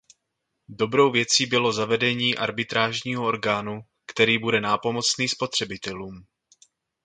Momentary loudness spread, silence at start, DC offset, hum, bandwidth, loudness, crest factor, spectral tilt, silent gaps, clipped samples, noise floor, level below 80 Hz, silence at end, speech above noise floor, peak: 14 LU; 0.7 s; under 0.1%; none; 9.6 kHz; -23 LUFS; 22 dB; -3 dB/octave; none; under 0.1%; -79 dBFS; -62 dBFS; 0.85 s; 55 dB; -2 dBFS